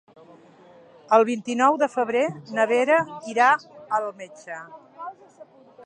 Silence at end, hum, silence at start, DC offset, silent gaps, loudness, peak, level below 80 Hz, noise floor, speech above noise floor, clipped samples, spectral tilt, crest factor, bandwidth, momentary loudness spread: 0 s; none; 1.1 s; under 0.1%; none; -22 LUFS; -4 dBFS; -78 dBFS; -51 dBFS; 29 dB; under 0.1%; -4.5 dB/octave; 20 dB; 9.6 kHz; 19 LU